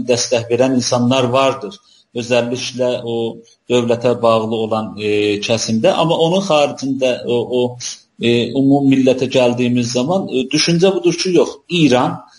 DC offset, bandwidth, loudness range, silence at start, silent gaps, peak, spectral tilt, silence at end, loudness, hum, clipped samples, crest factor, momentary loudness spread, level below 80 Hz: under 0.1%; 11.5 kHz; 3 LU; 0 s; none; 0 dBFS; -5 dB/octave; 0.15 s; -15 LUFS; none; under 0.1%; 14 dB; 7 LU; -56 dBFS